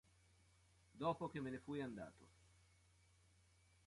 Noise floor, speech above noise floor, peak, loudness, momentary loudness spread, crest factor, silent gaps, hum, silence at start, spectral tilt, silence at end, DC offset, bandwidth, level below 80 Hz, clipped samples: -74 dBFS; 27 dB; -30 dBFS; -48 LUFS; 10 LU; 22 dB; none; none; 0.95 s; -7 dB/octave; 1.55 s; under 0.1%; 11.5 kHz; -76 dBFS; under 0.1%